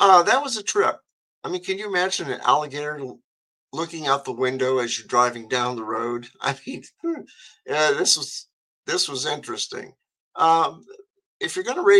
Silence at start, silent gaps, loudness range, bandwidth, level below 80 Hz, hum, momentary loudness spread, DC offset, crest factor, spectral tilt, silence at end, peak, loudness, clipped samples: 0 s; 1.13-1.42 s, 3.24-3.68 s, 8.53-8.83 s, 10.20-10.32 s, 11.10-11.14 s, 11.26-11.40 s; 2 LU; 12.5 kHz; -76 dBFS; none; 16 LU; under 0.1%; 22 dB; -2.5 dB/octave; 0 s; -2 dBFS; -23 LUFS; under 0.1%